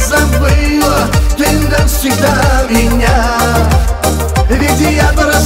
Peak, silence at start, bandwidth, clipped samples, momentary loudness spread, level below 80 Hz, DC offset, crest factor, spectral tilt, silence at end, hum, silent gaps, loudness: 0 dBFS; 0 s; 16.5 kHz; under 0.1%; 2 LU; -14 dBFS; under 0.1%; 8 dB; -5 dB/octave; 0 s; none; none; -11 LUFS